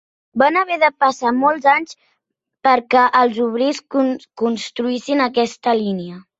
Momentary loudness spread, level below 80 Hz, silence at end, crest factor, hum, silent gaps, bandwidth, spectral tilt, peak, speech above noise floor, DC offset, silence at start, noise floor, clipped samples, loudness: 8 LU; -64 dBFS; 0.2 s; 16 dB; none; none; 8 kHz; -4.5 dB/octave; -2 dBFS; 31 dB; under 0.1%; 0.35 s; -48 dBFS; under 0.1%; -17 LUFS